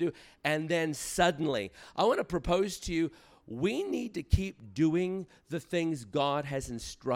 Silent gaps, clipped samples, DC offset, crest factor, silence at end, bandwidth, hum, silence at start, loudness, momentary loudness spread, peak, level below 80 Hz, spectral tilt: none; under 0.1%; under 0.1%; 20 dB; 0 s; 16.5 kHz; none; 0 s; -32 LUFS; 10 LU; -12 dBFS; -46 dBFS; -5 dB/octave